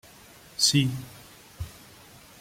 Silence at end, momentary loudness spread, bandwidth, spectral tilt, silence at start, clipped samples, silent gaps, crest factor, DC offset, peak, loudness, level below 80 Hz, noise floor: 0.65 s; 23 LU; 16.5 kHz; -3 dB/octave; 0.6 s; under 0.1%; none; 24 dB; under 0.1%; -8 dBFS; -23 LUFS; -54 dBFS; -51 dBFS